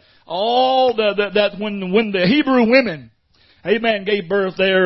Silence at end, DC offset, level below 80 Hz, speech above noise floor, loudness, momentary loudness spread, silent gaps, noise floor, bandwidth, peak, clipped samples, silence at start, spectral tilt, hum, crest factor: 0 s; under 0.1%; -56 dBFS; 38 dB; -17 LUFS; 10 LU; none; -55 dBFS; 6 kHz; 0 dBFS; under 0.1%; 0.3 s; -8 dB/octave; none; 16 dB